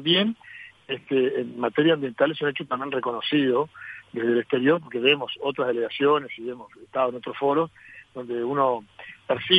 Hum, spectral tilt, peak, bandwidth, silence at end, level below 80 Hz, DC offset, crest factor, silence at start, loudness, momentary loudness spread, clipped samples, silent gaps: none; -7 dB/octave; -4 dBFS; 5 kHz; 0 s; -70 dBFS; under 0.1%; 20 dB; 0 s; -25 LUFS; 15 LU; under 0.1%; none